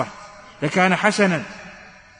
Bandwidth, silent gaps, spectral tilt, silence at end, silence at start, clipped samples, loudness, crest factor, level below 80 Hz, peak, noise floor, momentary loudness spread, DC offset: 10 kHz; none; -5 dB/octave; 0.3 s; 0 s; under 0.1%; -19 LUFS; 20 dB; -58 dBFS; -4 dBFS; -44 dBFS; 22 LU; under 0.1%